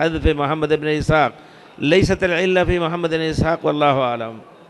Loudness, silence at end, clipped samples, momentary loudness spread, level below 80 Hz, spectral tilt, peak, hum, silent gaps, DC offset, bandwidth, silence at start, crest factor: -18 LUFS; 0.25 s; under 0.1%; 6 LU; -34 dBFS; -6 dB/octave; -4 dBFS; none; none; under 0.1%; 12 kHz; 0 s; 14 dB